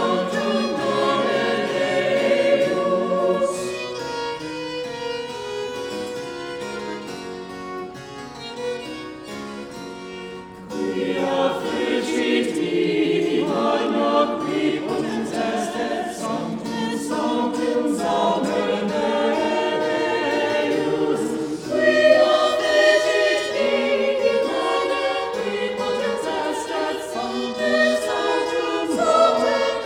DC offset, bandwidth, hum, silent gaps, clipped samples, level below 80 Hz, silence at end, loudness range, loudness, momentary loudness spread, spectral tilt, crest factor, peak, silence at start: under 0.1%; 16.5 kHz; none; none; under 0.1%; -58 dBFS; 0 s; 12 LU; -21 LUFS; 14 LU; -4 dB/octave; 18 dB; -4 dBFS; 0 s